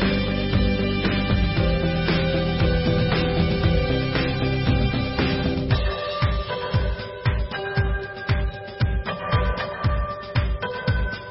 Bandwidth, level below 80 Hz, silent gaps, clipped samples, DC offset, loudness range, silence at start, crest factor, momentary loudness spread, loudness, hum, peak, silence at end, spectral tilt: 5.8 kHz; -28 dBFS; none; under 0.1%; under 0.1%; 4 LU; 0 s; 14 dB; 5 LU; -23 LUFS; none; -8 dBFS; 0 s; -10.5 dB/octave